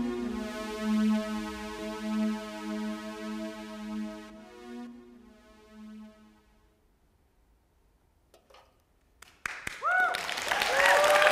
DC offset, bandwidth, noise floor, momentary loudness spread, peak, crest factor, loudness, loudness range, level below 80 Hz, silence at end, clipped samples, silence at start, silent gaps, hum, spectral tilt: under 0.1%; 16 kHz; -67 dBFS; 24 LU; -6 dBFS; 26 dB; -30 LUFS; 25 LU; -60 dBFS; 0 s; under 0.1%; 0 s; none; none; -3.5 dB/octave